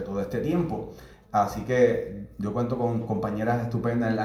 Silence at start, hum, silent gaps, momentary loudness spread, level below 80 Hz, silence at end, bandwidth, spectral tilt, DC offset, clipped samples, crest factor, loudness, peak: 0 s; none; none; 10 LU; -50 dBFS; 0 s; 14.5 kHz; -8 dB/octave; under 0.1%; under 0.1%; 18 dB; -27 LUFS; -10 dBFS